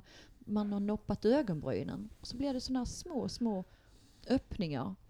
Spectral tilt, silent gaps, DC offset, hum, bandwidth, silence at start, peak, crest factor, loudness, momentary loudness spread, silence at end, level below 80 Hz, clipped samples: -6.5 dB/octave; none; under 0.1%; none; 12.5 kHz; 0.1 s; -18 dBFS; 18 dB; -36 LUFS; 13 LU; 0.15 s; -54 dBFS; under 0.1%